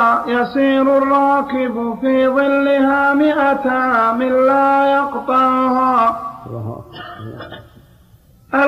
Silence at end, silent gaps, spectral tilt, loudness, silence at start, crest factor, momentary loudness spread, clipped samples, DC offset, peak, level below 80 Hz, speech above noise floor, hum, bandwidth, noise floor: 0 s; none; -7 dB/octave; -14 LUFS; 0 s; 12 dB; 17 LU; under 0.1%; under 0.1%; -4 dBFS; -52 dBFS; 33 dB; none; 11.5 kHz; -48 dBFS